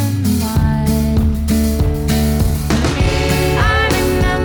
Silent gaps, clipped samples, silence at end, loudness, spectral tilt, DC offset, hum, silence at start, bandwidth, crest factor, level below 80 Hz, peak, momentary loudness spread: none; under 0.1%; 0 s; -15 LUFS; -5.5 dB/octave; under 0.1%; none; 0 s; over 20 kHz; 12 dB; -20 dBFS; -2 dBFS; 3 LU